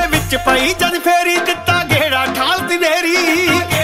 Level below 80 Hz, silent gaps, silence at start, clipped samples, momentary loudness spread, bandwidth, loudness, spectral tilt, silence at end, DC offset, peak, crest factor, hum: -36 dBFS; none; 0 s; under 0.1%; 2 LU; 16.5 kHz; -13 LUFS; -3.5 dB/octave; 0 s; under 0.1%; 0 dBFS; 14 dB; none